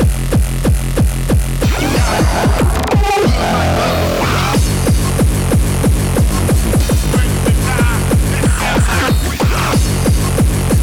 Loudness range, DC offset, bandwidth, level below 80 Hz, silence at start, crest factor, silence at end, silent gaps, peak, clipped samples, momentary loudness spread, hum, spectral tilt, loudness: 0 LU; under 0.1%; 18 kHz; -16 dBFS; 0 s; 12 dB; 0 s; none; 0 dBFS; under 0.1%; 2 LU; none; -5.5 dB/octave; -14 LUFS